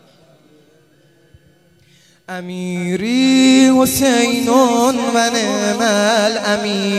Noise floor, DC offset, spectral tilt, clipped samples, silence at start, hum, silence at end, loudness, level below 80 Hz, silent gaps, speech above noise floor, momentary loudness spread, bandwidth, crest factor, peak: -52 dBFS; under 0.1%; -3.5 dB/octave; under 0.1%; 2.3 s; none; 0 s; -14 LUFS; -52 dBFS; none; 37 dB; 13 LU; 14.5 kHz; 16 dB; 0 dBFS